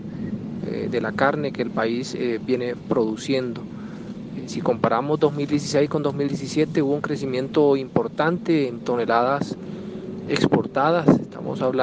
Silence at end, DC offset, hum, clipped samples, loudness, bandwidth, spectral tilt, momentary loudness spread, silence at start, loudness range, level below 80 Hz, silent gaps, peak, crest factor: 0 s; under 0.1%; none; under 0.1%; -23 LUFS; 9.6 kHz; -6.5 dB/octave; 12 LU; 0 s; 3 LU; -58 dBFS; none; -2 dBFS; 20 dB